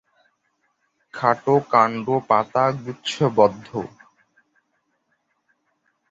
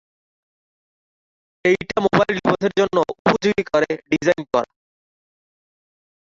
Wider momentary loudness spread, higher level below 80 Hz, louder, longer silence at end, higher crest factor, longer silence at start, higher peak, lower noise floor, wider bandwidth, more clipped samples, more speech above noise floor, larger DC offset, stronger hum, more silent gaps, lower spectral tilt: first, 14 LU vs 5 LU; second, -64 dBFS vs -54 dBFS; about the same, -20 LUFS vs -19 LUFS; first, 2.25 s vs 1.55 s; about the same, 22 dB vs 20 dB; second, 1.15 s vs 1.65 s; about the same, -2 dBFS vs -2 dBFS; second, -71 dBFS vs under -90 dBFS; about the same, 8 kHz vs 7.6 kHz; neither; second, 51 dB vs over 71 dB; neither; neither; second, none vs 3.19-3.25 s; about the same, -6 dB/octave vs -5.5 dB/octave